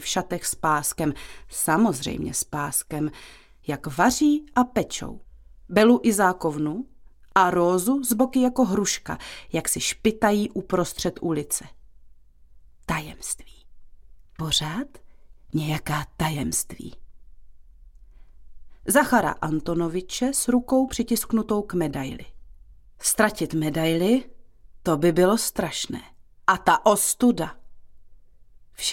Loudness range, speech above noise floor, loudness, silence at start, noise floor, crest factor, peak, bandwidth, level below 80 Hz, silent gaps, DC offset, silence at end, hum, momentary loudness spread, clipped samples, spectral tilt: 8 LU; 26 dB; -23 LUFS; 0 s; -49 dBFS; 22 dB; -4 dBFS; 17 kHz; -48 dBFS; none; under 0.1%; 0 s; none; 14 LU; under 0.1%; -4 dB/octave